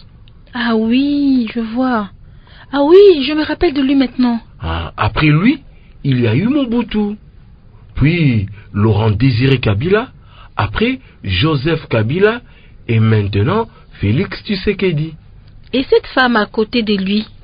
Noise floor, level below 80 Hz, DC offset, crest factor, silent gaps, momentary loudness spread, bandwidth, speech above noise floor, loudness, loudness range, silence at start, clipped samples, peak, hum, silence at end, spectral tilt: -40 dBFS; -34 dBFS; under 0.1%; 14 dB; none; 10 LU; 5.2 kHz; 27 dB; -14 LUFS; 4 LU; 0.5 s; under 0.1%; 0 dBFS; none; 0.2 s; -10 dB/octave